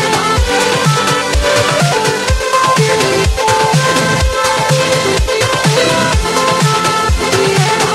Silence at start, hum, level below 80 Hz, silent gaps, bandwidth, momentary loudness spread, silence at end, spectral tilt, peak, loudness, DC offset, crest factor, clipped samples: 0 s; none; -22 dBFS; none; 16 kHz; 2 LU; 0 s; -3.5 dB/octave; 0 dBFS; -11 LUFS; under 0.1%; 12 dB; under 0.1%